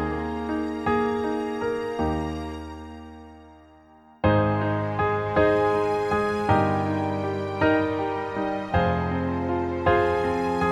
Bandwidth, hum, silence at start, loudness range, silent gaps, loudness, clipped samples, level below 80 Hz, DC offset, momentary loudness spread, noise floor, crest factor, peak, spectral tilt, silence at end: 12 kHz; none; 0 s; 5 LU; none; -25 LUFS; under 0.1%; -42 dBFS; under 0.1%; 8 LU; -52 dBFS; 18 dB; -6 dBFS; -7.5 dB/octave; 0 s